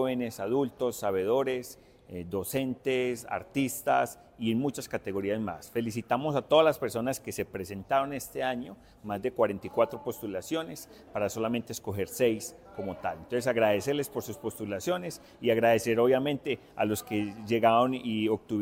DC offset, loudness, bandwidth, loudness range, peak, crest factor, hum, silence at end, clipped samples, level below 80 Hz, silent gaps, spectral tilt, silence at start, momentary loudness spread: under 0.1%; -30 LUFS; 16.5 kHz; 5 LU; -8 dBFS; 22 dB; none; 0 s; under 0.1%; -64 dBFS; none; -5 dB/octave; 0 s; 12 LU